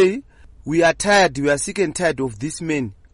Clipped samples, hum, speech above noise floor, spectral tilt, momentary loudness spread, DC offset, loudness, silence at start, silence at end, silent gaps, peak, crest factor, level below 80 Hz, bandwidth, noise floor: under 0.1%; none; 20 dB; -4 dB/octave; 11 LU; under 0.1%; -19 LUFS; 0 s; 0.2 s; none; -4 dBFS; 14 dB; -46 dBFS; 11.5 kHz; -38 dBFS